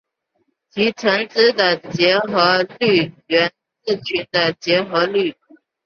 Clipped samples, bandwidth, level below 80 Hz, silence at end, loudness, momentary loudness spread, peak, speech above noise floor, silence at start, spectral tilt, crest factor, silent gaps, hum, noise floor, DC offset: under 0.1%; 7 kHz; -62 dBFS; 0.55 s; -17 LUFS; 7 LU; -2 dBFS; 51 dB; 0.75 s; -5 dB/octave; 18 dB; none; none; -69 dBFS; under 0.1%